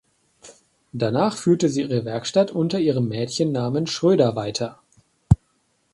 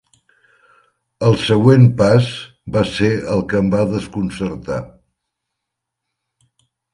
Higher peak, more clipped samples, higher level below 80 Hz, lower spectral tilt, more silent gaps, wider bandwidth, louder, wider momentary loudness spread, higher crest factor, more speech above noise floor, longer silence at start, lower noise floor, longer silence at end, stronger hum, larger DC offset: about the same, 0 dBFS vs 0 dBFS; neither; about the same, -42 dBFS vs -44 dBFS; about the same, -6.5 dB/octave vs -7.5 dB/octave; neither; about the same, 11.5 kHz vs 11 kHz; second, -22 LUFS vs -16 LUFS; second, 7 LU vs 14 LU; about the same, 22 dB vs 18 dB; second, 46 dB vs 65 dB; second, 0.45 s vs 1.2 s; second, -67 dBFS vs -80 dBFS; second, 0.6 s vs 2.05 s; neither; neither